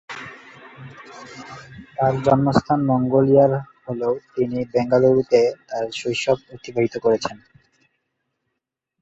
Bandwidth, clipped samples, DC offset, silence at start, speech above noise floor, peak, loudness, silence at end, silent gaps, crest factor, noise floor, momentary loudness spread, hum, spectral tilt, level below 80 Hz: 8 kHz; under 0.1%; under 0.1%; 0.1 s; 61 dB; -2 dBFS; -20 LUFS; 1.65 s; none; 18 dB; -80 dBFS; 22 LU; none; -7 dB/octave; -54 dBFS